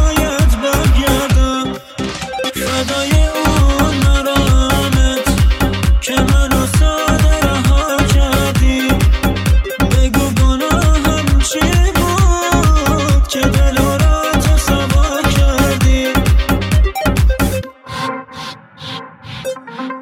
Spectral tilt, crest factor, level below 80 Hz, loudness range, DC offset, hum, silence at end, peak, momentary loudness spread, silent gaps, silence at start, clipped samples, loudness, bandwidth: -5 dB/octave; 12 dB; -16 dBFS; 2 LU; under 0.1%; none; 0 s; 0 dBFS; 10 LU; none; 0 s; under 0.1%; -14 LUFS; 16.5 kHz